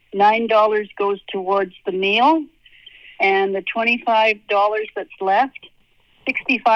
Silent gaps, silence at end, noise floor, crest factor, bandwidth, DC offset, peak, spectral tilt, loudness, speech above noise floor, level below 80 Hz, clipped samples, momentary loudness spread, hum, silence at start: none; 0 s; -56 dBFS; 16 dB; 7 kHz; under 0.1%; -4 dBFS; -5.5 dB/octave; -18 LUFS; 38 dB; -64 dBFS; under 0.1%; 9 LU; none; 0.15 s